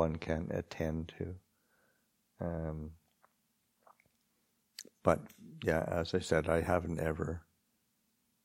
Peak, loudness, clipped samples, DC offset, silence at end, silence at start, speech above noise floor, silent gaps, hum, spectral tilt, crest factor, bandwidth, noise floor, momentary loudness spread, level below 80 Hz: -10 dBFS; -36 LUFS; under 0.1%; under 0.1%; 1.05 s; 0 s; 43 dB; none; none; -6.5 dB/octave; 26 dB; 16.5 kHz; -78 dBFS; 18 LU; -54 dBFS